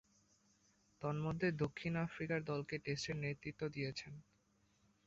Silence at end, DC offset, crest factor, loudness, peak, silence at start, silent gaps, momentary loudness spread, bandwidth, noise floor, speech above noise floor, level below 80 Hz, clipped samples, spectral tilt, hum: 0.85 s; under 0.1%; 18 dB; -42 LUFS; -26 dBFS; 1 s; none; 7 LU; 7.6 kHz; -76 dBFS; 35 dB; -68 dBFS; under 0.1%; -5.5 dB/octave; none